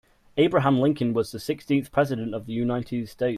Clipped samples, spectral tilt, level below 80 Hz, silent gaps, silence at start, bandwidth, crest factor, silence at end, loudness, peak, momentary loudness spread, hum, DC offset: under 0.1%; -7 dB/octave; -56 dBFS; none; 0.35 s; 15 kHz; 16 dB; 0 s; -25 LUFS; -8 dBFS; 10 LU; none; under 0.1%